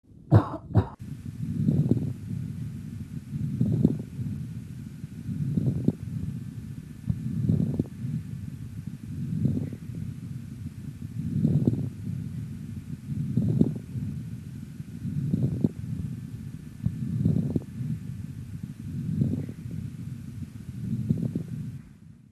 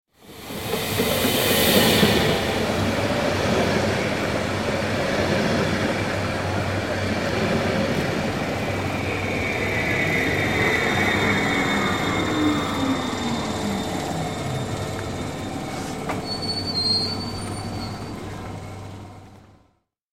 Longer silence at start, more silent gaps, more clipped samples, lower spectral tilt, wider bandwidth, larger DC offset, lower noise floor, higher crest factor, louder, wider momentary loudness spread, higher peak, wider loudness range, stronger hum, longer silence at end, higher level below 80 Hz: about the same, 0.1 s vs 0.2 s; neither; neither; first, -9.5 dB/octave vs -4.5 dB/octave; second, 13 kHz vs 17 kHz; second, under 0.1% vs 0.3%; second, -49 dBFS vs -65 dBFS; about the same, 24 dB vs 20 dB; second, -31 LUFS vs -22 LUFS; first, 14 LU vs 10 LU; about the same, -6 dBFS vs -4 dBFS; second, 4 LU vs 7 LU; neither; second, 0.15 s vs 0.55 s; second, -50 dBFS vs -44 dBFS